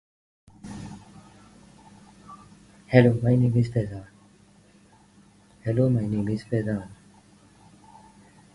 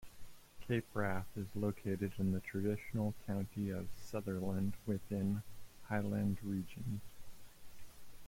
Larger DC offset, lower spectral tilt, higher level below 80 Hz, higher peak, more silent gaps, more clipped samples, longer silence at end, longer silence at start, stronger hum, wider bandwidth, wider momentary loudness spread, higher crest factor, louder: neither; first, -9 dB/octave vs -7.5 dB/octave; first, -54 dBFS vs -60 dBFS; first, 0 dBFS vs -24 dBFS; neither; neither; first, 1.6 s vs 0 s; first, 0.65 s vs 0 s; neither; second, 11 kHz vs 16.5 kHz; first, 28 LU vs 22 LU; first, 26 dB vs 16 dB; first, -24 LUFS vs -40 LUFS